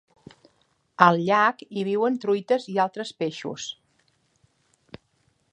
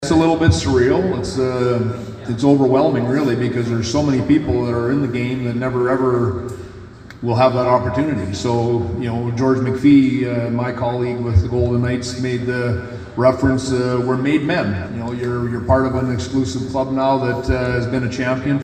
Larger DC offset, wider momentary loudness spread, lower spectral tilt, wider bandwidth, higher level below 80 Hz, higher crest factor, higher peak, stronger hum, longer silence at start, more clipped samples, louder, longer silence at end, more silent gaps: neither; first, 16 LU vs 8 LU; second, -5.5 dB/octave vs -7 dB/octave; about the same, 10 kHz vs 9.6 kHz; second, -72 dBFS vs -36 dBFS; first, 26 dB vs 16 dB; about the same, 0 dBFS vs 0 dBFS; neither; first, 1 s vs 0 s; neither; second, -23 LUFS vs -18 LUFS; first, 1.8 s vs 0 s; neither